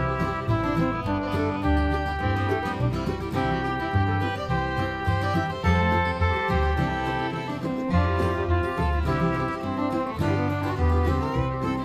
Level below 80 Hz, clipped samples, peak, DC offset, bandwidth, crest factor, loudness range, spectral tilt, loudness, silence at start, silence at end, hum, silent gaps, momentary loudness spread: -34 dBFS; under 0.1%; -8 dBFS; under 0.1%; 13 kHz; 16 dB; 1 LU; -7.5 dB/octave; -25 LUFS; 0 s; 0 s; none; none; 4 LU